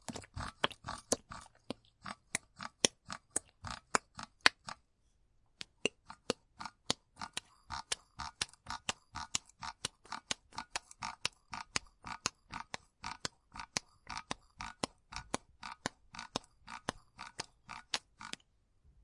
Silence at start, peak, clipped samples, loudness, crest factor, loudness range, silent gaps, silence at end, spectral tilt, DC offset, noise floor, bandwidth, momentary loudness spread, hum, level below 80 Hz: 0.1 s; -6 dBFS; under 0.1%; -40 LUFS; 38 dB; 8 LU; none; 0.75 s; -1.5 dB/octave; under 0.1%; -73 dBFS; 11.5 kHz; 13 LU; none; -64 dBFS